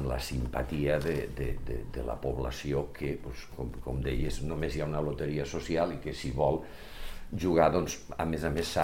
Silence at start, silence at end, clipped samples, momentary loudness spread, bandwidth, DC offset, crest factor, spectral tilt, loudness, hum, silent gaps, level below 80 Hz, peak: 0 s; 0 s; under 0.1%; 11 LU; 16 kHz; 0.4%; 22 dB; -6 dB/octave; -33 LUFS; none; none; -40 dBFS; -10 dBFS